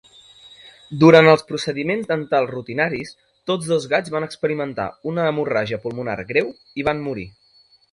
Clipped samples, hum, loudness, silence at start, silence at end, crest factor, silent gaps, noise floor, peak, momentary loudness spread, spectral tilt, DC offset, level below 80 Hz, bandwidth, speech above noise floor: under 0.1%; none; -20 LUFS; 0.65 s; 0.65 s; 20 dB; none; -56 dBFS; 0 dBFS; 16 LU; -6 dB/octave; under 0.1%; -56 dBFS; 11.5 kHz; 36 dB